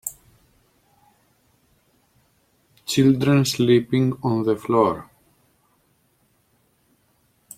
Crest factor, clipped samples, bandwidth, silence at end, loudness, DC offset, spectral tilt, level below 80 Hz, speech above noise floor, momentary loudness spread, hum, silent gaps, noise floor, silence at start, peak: 20 dB; under 0.1%; 16.5 kHz; 2.55 s; -20 LUFS; under 0.1%; -6 dB/octave; -60 dBFS; 46 dB; 12 LU; none; none; -64 dBFS; 0.05 s; -4 dBFS